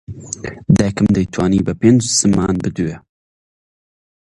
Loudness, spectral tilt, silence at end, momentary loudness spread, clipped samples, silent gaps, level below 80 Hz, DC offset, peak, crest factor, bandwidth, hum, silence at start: -15 LUFS; -5.5 dB/octave; 1.25 s; 14 LU; under 0.1%; none; -38 dBFS; under 0.1%; 0 dBFS; 16 dB; 11.5 kHz; none; 0.1 s